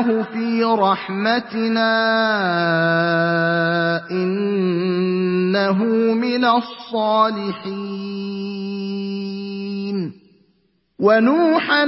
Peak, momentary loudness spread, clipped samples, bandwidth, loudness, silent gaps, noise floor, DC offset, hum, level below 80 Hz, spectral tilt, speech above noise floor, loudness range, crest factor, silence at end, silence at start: -2 dBFS; 10 LU; under 0.1%; 5.8 kHz; -19 LUFS; none; -63 dBFS; under 0.1%; none; -68 dBFS; -10 dB/octave; 45 dB; 7 LU; 16 dB; 0 s; 0 s